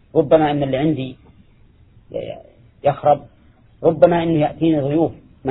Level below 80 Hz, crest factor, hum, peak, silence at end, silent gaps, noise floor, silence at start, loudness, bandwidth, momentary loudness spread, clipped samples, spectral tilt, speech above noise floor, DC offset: -48 dBFS; 18 dB; none; 0 dBFS; 0 s; none; -50 dBFS; 0.15 s; -18 LUFS; 4.1 kHz; 16 LU; under 0.1%; -11.5 dB/octave; 34 dB; under 0.1%